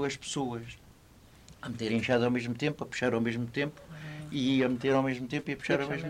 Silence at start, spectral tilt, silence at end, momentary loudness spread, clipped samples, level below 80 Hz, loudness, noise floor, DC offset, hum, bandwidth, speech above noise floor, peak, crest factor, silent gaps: 0 s; -5.5 dB/octave; 0 s; 15 LU; under 0.1%; -60 dBFS; -31 LUFS; -57 dBFS; under 0.1%; none; 14 kHz; 26 dB; -14 dBFS; 16 dB; none